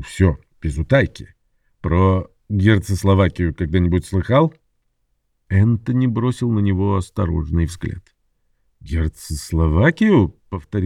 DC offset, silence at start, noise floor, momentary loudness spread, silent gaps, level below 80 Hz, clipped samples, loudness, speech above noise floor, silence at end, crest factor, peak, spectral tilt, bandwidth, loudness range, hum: under 0.1%; 0 s; -68 dBFS; 11 LU; none; -32 dBFS; under 0.1%; -19 LUFS; 50 dB; 0 s; 16 dB; -2 dBFS; -7.5 dB/octave; 13 kHz; 4 LU; none